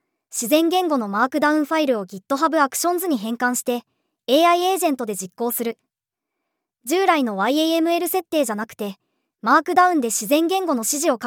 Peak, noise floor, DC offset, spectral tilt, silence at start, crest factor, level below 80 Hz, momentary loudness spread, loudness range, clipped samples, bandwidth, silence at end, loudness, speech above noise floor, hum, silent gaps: -2 dBFS; -85 dBFS; under 0.1%; -3 dB/octave; 0.3 s; 18 dB; -80 dBFS; 11 LU; 3 LU; under 0.1%; over 20 kHz; 0 s; -20 LUFS; 65 dB; none; none